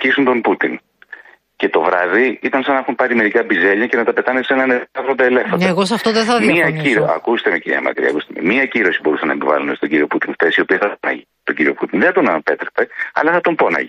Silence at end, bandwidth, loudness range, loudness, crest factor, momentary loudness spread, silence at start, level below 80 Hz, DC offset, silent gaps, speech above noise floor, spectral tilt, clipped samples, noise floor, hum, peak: 0 s; 15 kHz; 2 LU; -15 LUFS; 14 dB; 5 LU; 0 s; -62 dBFS; under 0.1%; none; 24 dB; -5.5 dB/octave; under 0.1%; -40 dBFS; none; -2 dBFS